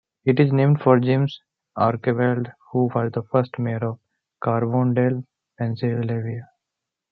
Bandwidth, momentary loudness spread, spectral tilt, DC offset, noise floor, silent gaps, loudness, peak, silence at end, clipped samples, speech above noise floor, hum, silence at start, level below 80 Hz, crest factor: 4.8 kHz; 12 LU; -10.5 dB/octave; under 0.1%; -84 dBFS; none; -22 LUFS; -2 dBFS; 0.65 s; under 0.1%; 63 dB; none; 0.25 s; -66 dBFS; 20 dB